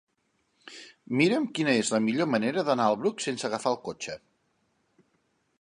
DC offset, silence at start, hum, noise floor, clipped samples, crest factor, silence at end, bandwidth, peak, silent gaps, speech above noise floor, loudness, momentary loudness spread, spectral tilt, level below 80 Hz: under 0.1%; 0.65 s; none; -74 dBFS; under 0.1%; 20 dB; 1.45 s; 11 kHz; -10 dBFS; none; 47 dB; -27 LUFS; 20 LU; -4.5 dB/octave; -74 dBFS